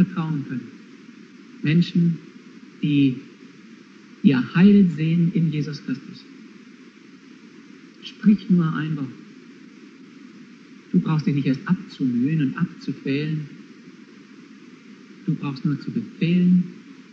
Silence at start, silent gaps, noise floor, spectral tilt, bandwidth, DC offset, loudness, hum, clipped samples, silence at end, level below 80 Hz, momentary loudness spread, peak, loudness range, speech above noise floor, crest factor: 0 s; none; -46 dBFS; -8.5 dB/octave; 6.6 kHz; under 0.1%; -22 LUFS; none; under 0.1%; 0.1 s; -64 dBFS; 16 LU; -2 dBFS; 7 LU; 26 dB; 20 dB